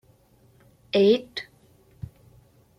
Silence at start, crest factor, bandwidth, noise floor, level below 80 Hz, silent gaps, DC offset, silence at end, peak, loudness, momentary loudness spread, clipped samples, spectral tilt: 0.95 s; 20 dB; 9.4 kHz; -59 dBFS; -60 dBFS; none; under 0.1%; 1.35 s; -8 dBFS; -23 LUFS; 24 LU; under 0.1%; -6.5 dB/octave